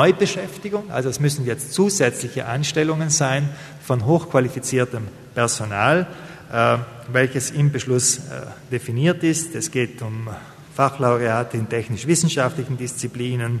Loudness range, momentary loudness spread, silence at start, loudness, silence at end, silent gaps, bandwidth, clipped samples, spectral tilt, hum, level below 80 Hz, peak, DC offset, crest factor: 2 LU; 11 LU; 0 s; -21 LUFS; 0 s; none; 13.5 kHz; under 0.1%; -4.5 dB/octave; none; -58 dBFS; -2 dBFS; under 0.1%; 20 dB